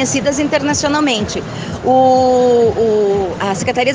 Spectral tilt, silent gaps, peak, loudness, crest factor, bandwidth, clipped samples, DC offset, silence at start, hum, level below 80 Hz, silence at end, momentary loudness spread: -4 dB/octave; none; 0 dBFS; -14 LUFS; 14 dB; 10 kHz; under 0.1%; under 0.1%; 0 s; none; -42 dBFS; 0 s; 8 LU